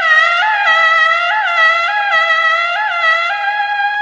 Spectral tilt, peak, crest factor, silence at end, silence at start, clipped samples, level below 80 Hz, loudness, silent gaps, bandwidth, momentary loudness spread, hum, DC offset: 1 dB/octave; -2 dBFS; 12 dB; 0 s; 0 s; under 0.1%; -60 dBFS; -11 LUFS; none; 8.8 kHz; 6 LU; 50 Hz at -60 dBFS; under 0.1%